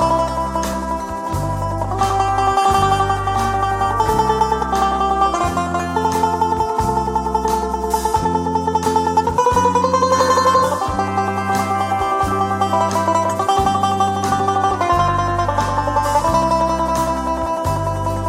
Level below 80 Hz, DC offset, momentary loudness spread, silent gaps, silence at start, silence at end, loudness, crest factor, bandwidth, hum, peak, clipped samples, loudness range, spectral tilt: -34 dBFS; under 0.1%; 5 LU; none; 0 s; 0 s; -17 LUFS; 12 dB; 16.5 kHz; none; -4 dBFS; under 0.1%; 2 LU; -5 dB/octave